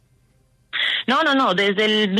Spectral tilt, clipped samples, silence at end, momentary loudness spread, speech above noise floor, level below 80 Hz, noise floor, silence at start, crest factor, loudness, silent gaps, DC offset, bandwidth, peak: -4.5 dB/octave; under 0.1%; 0 s; 5 LU; 42 dB; -66 dBFS; -60 dBFS; 0.75 s; 14 dB; -18 LUFS; none; under 0.1%; 13 kHz; -6 dBFS